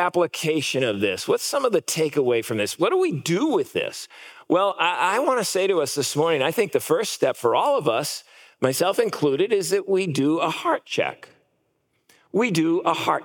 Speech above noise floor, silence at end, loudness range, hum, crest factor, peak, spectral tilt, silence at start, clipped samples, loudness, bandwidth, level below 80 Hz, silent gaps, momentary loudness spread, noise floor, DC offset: 48 dB; 0 s; 3 LU; none; 18 dB; -6 dBFS; -4 dB/octave; 0 s; under 0.1%; -22 LUFS; 18 kHz; -78 dBFS; none; 5 LU; -70 dBFS; under 0.1%